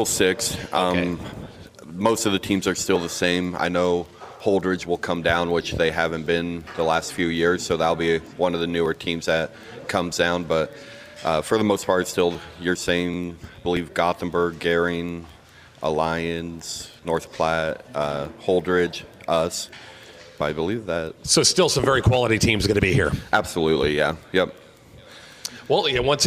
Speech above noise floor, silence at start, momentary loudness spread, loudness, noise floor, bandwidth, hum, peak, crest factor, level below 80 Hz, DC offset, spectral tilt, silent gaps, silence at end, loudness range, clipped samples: 25 dB; 0 s; 13 LU; -23 LUFS; -47 dBFS; 15.5 kHz; none; -2 dBFS; 20 dB; -44 dBFS; under 0.1%; -4 dB/octave; none; 0 s; 5 LU; under 0.1%